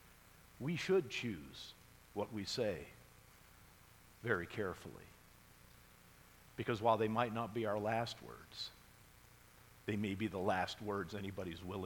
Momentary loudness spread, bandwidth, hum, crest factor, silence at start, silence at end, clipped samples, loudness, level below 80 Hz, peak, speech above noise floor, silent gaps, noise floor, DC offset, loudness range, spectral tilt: 26 LU; 19 kHz; none; 22 dB; 0.05 s; 0 s; under 0.1%; -40 LUFS; -68 dBFS; -20 dBFS; 23 dB; none; -63 dBFS; under 0.1%; 7 LU; -5.5 dB/octave